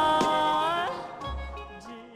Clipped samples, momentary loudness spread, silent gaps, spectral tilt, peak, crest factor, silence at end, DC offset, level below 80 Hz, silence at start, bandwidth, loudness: under 0.1%; 18 LU; none; -4 dB/octave; -14 dBFS; 14 dB; 0 s; under 0.1%; -44 dBFS; 0 s; 15.5 kHz; -27 LUFS